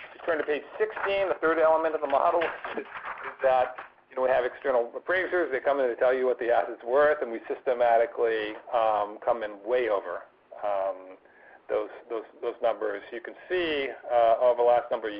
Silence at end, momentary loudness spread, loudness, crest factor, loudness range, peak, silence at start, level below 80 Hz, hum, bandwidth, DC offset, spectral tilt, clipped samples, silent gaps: 0 s; 13 LU; -27 LUFS; 16 dB; 6 LU; -12 dBFS; 0 s; -66 dBFS; none; 5.2 kHz; under 0.1%; -7.5 dB/octave; under 0.1%; none